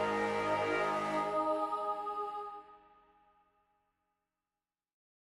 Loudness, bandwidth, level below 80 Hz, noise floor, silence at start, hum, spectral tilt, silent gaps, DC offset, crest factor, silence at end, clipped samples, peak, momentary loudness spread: -35 LUFS; 13 kHz; -72 dBFS; under -90 dBFS; 0 s; none; -5 dB/octave; none; under 0.1%; 16 dB; 2.55 s; under 0.1%; -22 dBFS; 10 LU